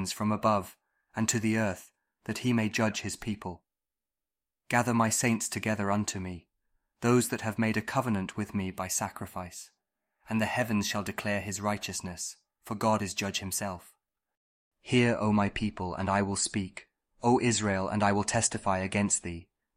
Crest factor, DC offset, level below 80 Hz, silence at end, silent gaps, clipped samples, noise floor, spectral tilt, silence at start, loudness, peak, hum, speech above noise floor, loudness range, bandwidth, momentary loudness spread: 20 dB; under 0.1%; -58 dBFS; 0.35 s; 14.37-14.71 s; under 0.1%; under -90 dBFS; -4.5 dB/octave; 0 s; -30 LUFS; -10 dBFS; none; over 60 dB; 4 LU; 16 kHz; 14 LU